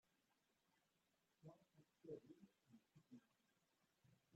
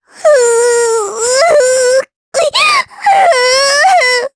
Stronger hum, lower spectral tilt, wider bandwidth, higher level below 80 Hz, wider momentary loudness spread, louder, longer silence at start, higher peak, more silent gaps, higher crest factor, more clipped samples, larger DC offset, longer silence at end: neither; first, -7.5 dB/octave vs 1.5 dB/octave; second, 7.6 kHz vs 11 kHz; second, under -90 dBFS vs -54 dBFS; first, 9 LU vs 6 LU; second, -65 LUFS vs -9 LUFS; second, 0.05 s vs 0.2 s; second, -44 dBFS vs 0 dBFS; second, none vs 2.16-2.32 s; first, 24 dB vs 10 dB; neither; neither; about the same, 0 s vs 0.1 s